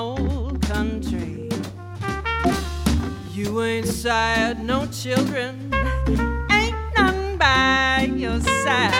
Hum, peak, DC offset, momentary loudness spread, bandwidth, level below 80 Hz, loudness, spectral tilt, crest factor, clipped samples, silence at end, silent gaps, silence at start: none; -2 dBFS; under 0.1%; 11 LU; 16.5 kHz; -30 dBFS; -21 LUFS; -4.5 dB/octave; 18 dB; under 0.1%; 0 s; none; 0 s